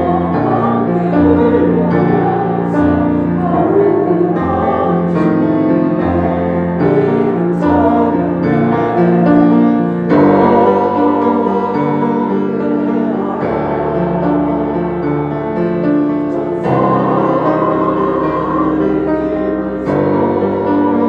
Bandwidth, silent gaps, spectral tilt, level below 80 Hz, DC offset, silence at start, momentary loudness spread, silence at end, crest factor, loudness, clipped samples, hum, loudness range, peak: 5.2 kHz; none; -10 dB/octave; -42 dBFS; under 0.1%; 0 s; 6 LU; 0 s; 12 dB; -13 LUFS; under 0.1%; none; 4 LU; 0 dBFS